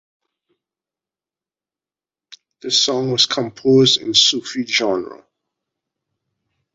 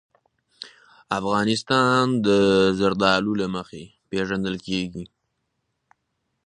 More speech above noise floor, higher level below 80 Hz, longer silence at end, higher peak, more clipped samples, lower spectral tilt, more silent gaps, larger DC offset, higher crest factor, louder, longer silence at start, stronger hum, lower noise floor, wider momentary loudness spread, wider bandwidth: first, over 73 dB vs 54 dB; second, -64 dBFS vs -54 dBFS; first, 1.6 s vs 1.4 s; about the same, -2 dBFS vs -2 dBFS; neither; second, -3 dB/octave vs -5.5 dB/octave; neither; neither; about the same, 20 dB vs 22 dB; first, -15 LUFS vs -22 LUFS; first, 2.65 s vs 0.6 s; neither; first, under -90 dBFS vs -76 dBFS; second, 11 LU vs 23 LU; second, 8 kHz vs 10.5 kHz